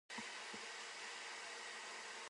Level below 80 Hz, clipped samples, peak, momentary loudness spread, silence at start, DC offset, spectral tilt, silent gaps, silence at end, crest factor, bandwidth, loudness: under -90 dBFS; under 0.1%; -36 dBFS; 1 LU; 0.1 s; under 0.1%; 0 dB/octave; none; 0 s; 14 dB; 11.5 kHz; -48 LUFS